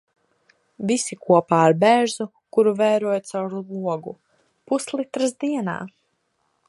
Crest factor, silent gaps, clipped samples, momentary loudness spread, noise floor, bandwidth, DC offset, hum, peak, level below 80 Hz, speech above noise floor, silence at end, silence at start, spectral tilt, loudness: 20 dB; none; under 0.1%; 14 LU; -70 dBFS; 11.5 kHz; under 0.1%; none; -2 dBFS; -72 dBFS; 50 dB; 0.8 s; 0.8 s; -5 dB/octave; -21 LUFS